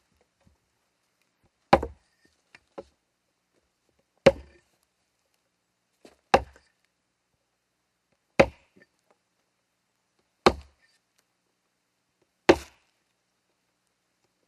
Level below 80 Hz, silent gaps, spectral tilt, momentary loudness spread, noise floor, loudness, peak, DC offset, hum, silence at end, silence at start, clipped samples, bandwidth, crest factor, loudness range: -50 dBFS; none; -5 dB/octave; 24 LU; -77 dBFS; -24 LUFS; -2 dBFS; under 0.1%; 60 Hz at -65 dBFS; 1.9 s; 1.7 s; under 0.1%; 13 kHz; 30 dB; 4 LU